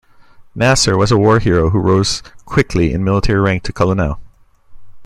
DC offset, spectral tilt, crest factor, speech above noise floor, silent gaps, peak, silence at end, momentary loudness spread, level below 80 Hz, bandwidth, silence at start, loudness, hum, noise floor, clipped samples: under 0.1%; -5.5 dB/octave; 14 dB; 29 dB; none; 0 dBFS; 0 s; 7 LU; -30 dBFS; 12.5 kHz; 0.4 s; -14 LUFS; none; -42 dBFS; under 0.1%